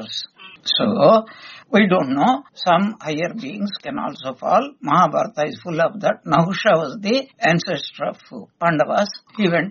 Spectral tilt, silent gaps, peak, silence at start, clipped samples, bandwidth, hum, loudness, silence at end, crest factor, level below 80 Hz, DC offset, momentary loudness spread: -3.5 dB/octave; none; -2 dBFS; 0 s; under 0.1%; 7.2 kHz; none; -19 LUFS; 0 s; 18 dB; -62 dBFS; under 0.1%; 12 LU